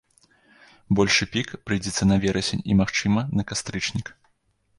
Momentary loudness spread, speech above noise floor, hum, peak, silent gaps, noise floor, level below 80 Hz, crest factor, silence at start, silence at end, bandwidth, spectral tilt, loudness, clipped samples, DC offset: 9 LU; 44 dB; none; -6 dBFS; none; -67 dBFS; -44 dBFS; 18 dB; 0.9 s; 0.65 s; 11.5 kHz; -4.5 dB/octave; -23 LUFS; under 0.1%; under 0.1%